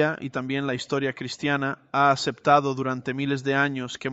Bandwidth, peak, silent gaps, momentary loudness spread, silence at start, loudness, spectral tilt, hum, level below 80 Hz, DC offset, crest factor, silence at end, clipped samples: 8.2 kHz; -6 dBFS; none; 8 LU; 0 s; -25 LUFS; -5.5 dB/octave; none; -64 dBFS; under 0.1%; 20 dB; 0 s; under 0.1%